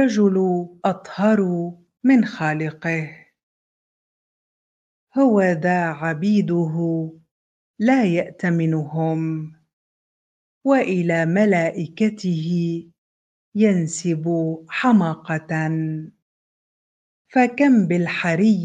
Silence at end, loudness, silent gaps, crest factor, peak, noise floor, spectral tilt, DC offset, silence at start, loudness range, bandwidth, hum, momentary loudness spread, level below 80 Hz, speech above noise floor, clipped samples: 0 s; -20 LUFS; 3.43-5.07 s, 7.31-7.74 s, 9.73-10.61 s, 12.98-13.52 s, 16.22-17.25 s; 16 dB; -4 dBFS; under -90 dBFS; -7 dB/octave; under 0.1%; 0 s; 3 LU; 9.4 kHz; none; 10 LU; -68 dBFS; over 71 dB; under 0.1%